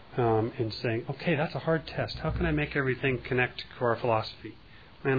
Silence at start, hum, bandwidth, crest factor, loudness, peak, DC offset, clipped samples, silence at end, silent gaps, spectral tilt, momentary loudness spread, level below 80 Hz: 0 s; none; 5 kHz; 18 dB; -30 LUFS; -12 dBFS; 0.2%; under 0.1%; 0 s; none; -8.5 dB/octave; 6 LU; -46 dBFS